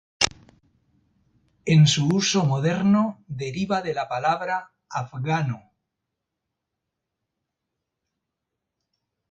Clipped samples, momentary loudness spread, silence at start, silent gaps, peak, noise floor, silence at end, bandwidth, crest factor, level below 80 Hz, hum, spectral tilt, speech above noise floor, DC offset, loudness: under 0.1%; 14 LU; 0.2 s; none; 0 dBFS; -83 dBFS; 3.7 s; 9.4 kHz; 24 dB; -60 dBFS; none; -5 dB/octave; 61 dB; under 0.1%; -23 LUFS